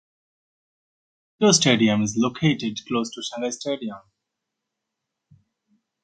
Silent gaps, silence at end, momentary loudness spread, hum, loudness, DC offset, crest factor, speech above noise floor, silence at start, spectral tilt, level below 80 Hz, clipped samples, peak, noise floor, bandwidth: none; 2.05 s; 13 LU; none; -22 LUFS; under 0.1%; 22 dB; 61 dB; 1.4 s; -4 dB/octave; -62 dBFS; under 0.1%; -4 dBFS; -83 dBFS; 9.4 kHz